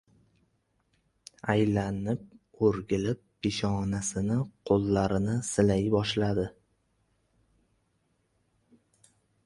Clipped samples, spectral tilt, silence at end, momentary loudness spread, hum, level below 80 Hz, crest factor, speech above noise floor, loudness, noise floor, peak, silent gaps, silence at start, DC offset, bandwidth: under 0.1%; -6 dB/octave; 2.95 s; 7 LU; none; -52 dBFS; 20 dB; 46 dB; -29 LUFS; -73 dBFS; -10 dBFS; none; 1.45 s; under 0.1%; 11.5 kHz